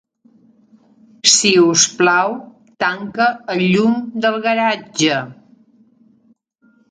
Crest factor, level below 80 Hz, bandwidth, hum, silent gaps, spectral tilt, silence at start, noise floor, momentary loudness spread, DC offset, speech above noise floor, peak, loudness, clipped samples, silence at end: 18 dB; -64 dBFS; 10.5 kHz; none; none; -2.5 dB/octave; 1.25 s; -57 dBFS; 10 LU; under 0.1%; 41 dB; 0 dBFS; -15 LUFS; under 0.1%; 1.55 s